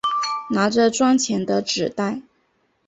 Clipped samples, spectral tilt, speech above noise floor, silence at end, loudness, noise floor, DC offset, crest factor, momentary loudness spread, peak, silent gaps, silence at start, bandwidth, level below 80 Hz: under 0.1%; -4 dB/octave; 46 dB; 0.65 s; -20 LUFS; -66 dBFS; under 0.1%; 16 dB; 9 LU; -4 dBFS; none; 0.05 s; 8.2 kHz; -60 dBFS